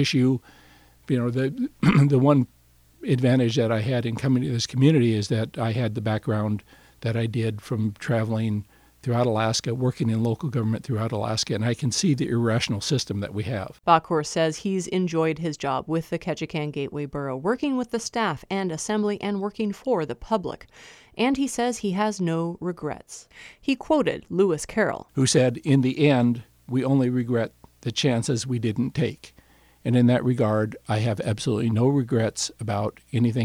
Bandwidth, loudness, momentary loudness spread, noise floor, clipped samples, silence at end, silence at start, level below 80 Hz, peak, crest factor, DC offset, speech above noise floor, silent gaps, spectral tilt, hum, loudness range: 14.5 kHz; -24 LUFS; 9 LU; -56 dBFS; under 0.1%; 0 s; 0 s; -56 dBFS; -4 dBFS; 20 dB; under 0.1%; 32 dB; none; -6 dB/octave; none; 5 LU